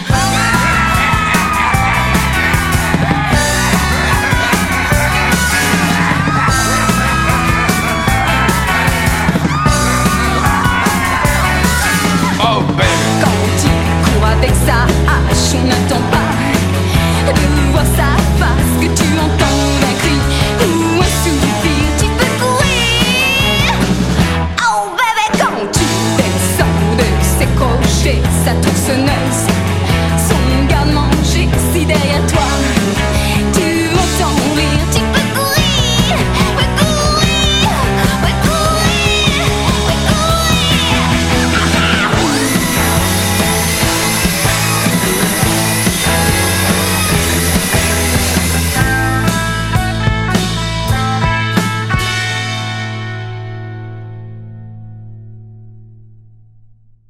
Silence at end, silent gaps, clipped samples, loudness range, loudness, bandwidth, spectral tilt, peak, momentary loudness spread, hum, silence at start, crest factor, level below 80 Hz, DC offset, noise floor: 1.15 s; none; under 0.1%; 2 LU; -12 LUFS; 16.5 kHz; -4 dB/octave; 0 dBFS; 3 LU; none; 0 s; 12 dB; -20 dBFS; under 0.1%; -44 dBFS